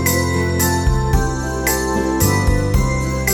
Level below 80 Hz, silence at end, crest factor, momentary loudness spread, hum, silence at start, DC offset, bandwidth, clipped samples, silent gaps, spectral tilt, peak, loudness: -22 dBFS; 0 s; 16 dB; 3 LU; none; 0 s; under 0.1%; 19.5 kHz; under 0.1%; none; -5 dB/octave; -2 dBFS; -17 LUFS